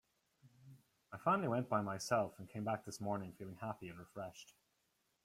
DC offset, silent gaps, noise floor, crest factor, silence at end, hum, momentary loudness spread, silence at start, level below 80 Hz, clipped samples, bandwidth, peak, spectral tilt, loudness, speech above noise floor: under 0.1%; none; -82 dBFS; 20 dB; 0.8 s; none; 15 LU; 0.45 s; -78 dBFS; under 0.1%; 16 kHz; -22 dBFS; -5.5 dB/octave; -41 LUFS; 41 dB